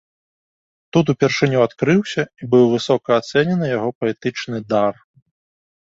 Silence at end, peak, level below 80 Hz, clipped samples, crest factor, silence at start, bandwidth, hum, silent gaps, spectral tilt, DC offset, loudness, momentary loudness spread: 0.9 s; -2 dBFS; -58 dBFS; under 0.1%; 18 dB; 0.95 s; 7.8 kHz; none; 3.95-4.01 s; -6.5 dB/octave; under 0.1%; -18 LUFS; 8 LU